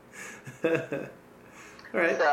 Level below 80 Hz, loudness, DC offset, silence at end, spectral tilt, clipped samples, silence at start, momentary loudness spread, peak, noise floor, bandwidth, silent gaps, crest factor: -70 dBFS; -29 LUFS; under 0.1%; 0 s; -5 dB/octave; under 0.1%; 0.15 s; 22 LU; -12 dBFS; -50 dBFS; 15 kHz; none; 20 dB